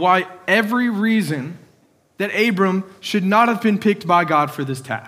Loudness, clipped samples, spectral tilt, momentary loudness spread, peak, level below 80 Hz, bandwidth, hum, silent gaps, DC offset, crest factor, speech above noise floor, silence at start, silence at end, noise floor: -18 LUFS; under 0.1%; -6 dB/octave; 9 LU; -2 dBFS; -72 dBFS; 16 kHz; none; none; under 0.1%; 18 dB; 39 dB; 0 s; 0 s; -57 dBFS